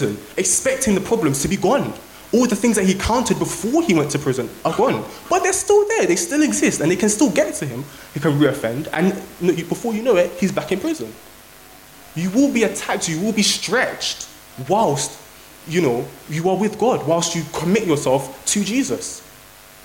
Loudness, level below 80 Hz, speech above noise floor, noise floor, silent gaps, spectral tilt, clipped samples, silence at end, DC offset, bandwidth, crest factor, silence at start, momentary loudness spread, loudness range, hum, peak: -19 LUFS; -46 dBFS; 25 dB; -44 dBFS; none; -4 dB/octave; under 0.1%; 0.45 s; under 0.1%; 17 kHz; 16 dB; 0 s; 10 LU; 4 LU; none; -4 dBFS